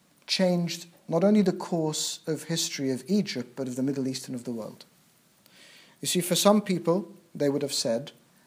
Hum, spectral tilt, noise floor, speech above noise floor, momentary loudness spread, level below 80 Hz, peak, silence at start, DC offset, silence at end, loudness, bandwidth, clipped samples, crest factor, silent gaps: none; -4.5 dB/octave; -62 dBFS; 35 dB; 13 LU; -78 dBFS; -6 dBFS; 0.3 s; under 0.1%; 0.35 s; -27 LUFS; 16 kHz; under 0.1%; 22 dB; none